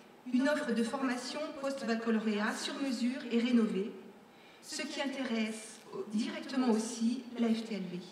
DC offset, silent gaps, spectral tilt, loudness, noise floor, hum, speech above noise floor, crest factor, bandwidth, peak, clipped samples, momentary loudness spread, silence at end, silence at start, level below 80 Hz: under 0.1%; none; -4.5 dB/octave; -34 LUFS; -57 dBFS; none; 23 dB; 16 dB; 13.5 kHz; -20 dBFS; under 0.1%; 9 LU; 0 s; 0 s; -86 dBFS